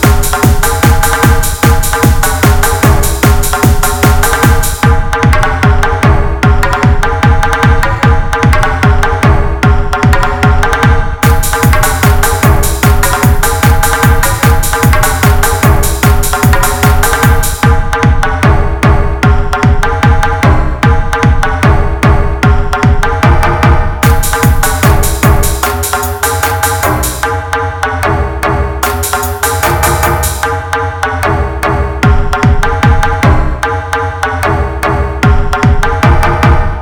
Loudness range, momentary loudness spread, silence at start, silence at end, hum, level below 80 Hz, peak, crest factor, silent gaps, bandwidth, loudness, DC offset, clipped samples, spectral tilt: 3 LU; 4 LU; 0 s; 0 s; none; -12 dBFS; 0 dBFS; 8 dB; none; 20 kHz; -10 LUFS; 0.7%; 0.8%; -5 dB/octave